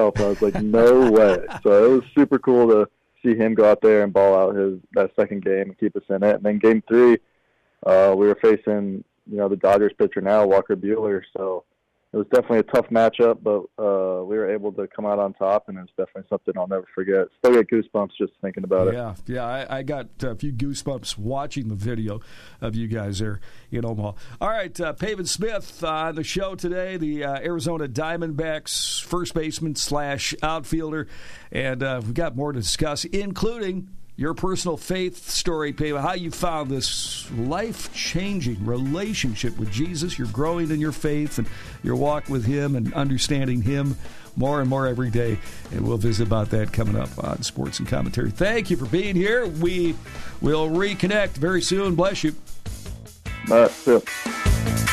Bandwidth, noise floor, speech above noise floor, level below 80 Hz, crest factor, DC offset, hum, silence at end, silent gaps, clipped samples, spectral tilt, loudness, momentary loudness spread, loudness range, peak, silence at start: 14 kHz; -65 dBFS; 44 dB; -40 dBFS; 14 dB; under 0.1%; none; 0 s; none; under 0.1%; -5.5 dB/octave; -22 LUFS; 13 LU; 8 LU; -8 dBFS; 0 s